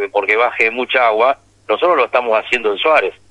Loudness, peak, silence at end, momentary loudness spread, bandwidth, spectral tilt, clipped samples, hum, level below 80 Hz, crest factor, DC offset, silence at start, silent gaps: -14 LUFS; 0 dBFS; 0.2 s; 4 LU; 10.5 kHz; -3 dB/octave; under 0.1%; none; -58 dBFS; 14 dB; under 0.1%; 0 s; none